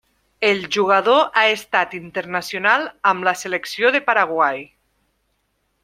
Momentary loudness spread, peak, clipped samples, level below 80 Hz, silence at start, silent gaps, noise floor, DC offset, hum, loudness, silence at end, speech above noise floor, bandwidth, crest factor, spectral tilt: 10 LU; -2 dBFS; under 0.1%; -66 dBFS; 0.4 s; none; -69 dBFS; under 0.1%; none; -18 LUFS; 1.2 s; 50 dB; 16 kHz; 18 dB; -3 dB/octave